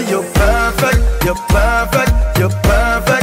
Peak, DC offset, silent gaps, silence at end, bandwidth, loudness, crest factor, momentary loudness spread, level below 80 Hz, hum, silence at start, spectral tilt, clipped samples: -2 dBFS; under 0.1%; none; 0 s; 16.5 kHz; -14 LUFS; 10 dB; 3 LU; -16 dBFS; none; 0 s; -5 dB/octave; under 0.1%